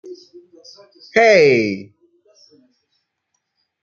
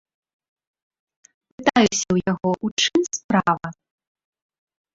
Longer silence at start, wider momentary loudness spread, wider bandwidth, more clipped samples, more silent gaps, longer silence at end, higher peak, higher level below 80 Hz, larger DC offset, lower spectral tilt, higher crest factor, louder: second, 0.05 s vs 1.6 s; first, 20 LU vs 6 LU; second, 7.2 kHz vs 8 kHz; neither; second, none vs 2.71-2.77 s, 3.24-3.29 s; first, 2 s vs 1.2 s; about the same, -2 dBFS vs -2 dBFS; second, -66 dBFS vs -56 dBFS; neither; about the same, -5 dB/octave vs -4 dB/octave; about the same, 18 dB vs 22 dB; first, -14 LUFS vs -21 LUFS